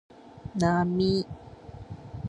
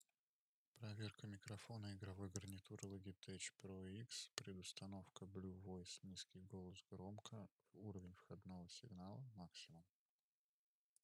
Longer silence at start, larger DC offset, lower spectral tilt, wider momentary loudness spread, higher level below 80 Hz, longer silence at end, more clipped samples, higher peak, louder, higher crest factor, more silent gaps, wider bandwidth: second, 0.25 s vs 0.75 s; neither; first, -6.5 dB/octave vs -4.5 dB/octave; first, 20 LU vs 6 LU; first, -50 dBFS vs -86 dBFS; second, 0 s vs 1.2 s; neither; first, -8 dBFS vs -22 dBFS; first, -27 LUFS vs -56 LUFS; second, 20 dB vs 34 dB; second, none vs 4.33-4.37 s, 7.51-7.58 s; second, 11 kHz vs 14.5 kHz